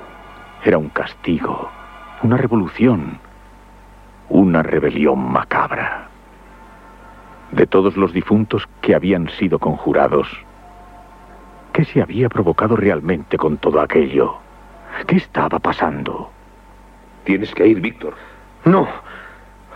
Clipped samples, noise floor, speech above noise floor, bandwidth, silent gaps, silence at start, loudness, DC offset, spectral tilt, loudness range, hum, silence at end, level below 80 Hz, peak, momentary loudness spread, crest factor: under 0.1%; -43 dBFS; 27 dB; 8.6 kHz; none; 0 s; -17 LUFS; under 0.1%; -9 dB/octave; 3 LU; none; 0 s; -44 dBFS; 0 dBFS; 16 LU; 18 dB